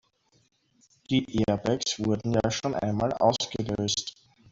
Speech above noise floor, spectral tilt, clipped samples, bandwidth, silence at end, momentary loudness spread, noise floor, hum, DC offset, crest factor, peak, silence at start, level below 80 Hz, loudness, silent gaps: 38 dB; -5 dB/octave; under 0.1%; 8 kHz; 0.4 s; 5 LU; -65 dBFS; none; under 0.1%; 20 dB; -8 dBFS; 1.1 s; -54 dBFS; -27 LUFS; none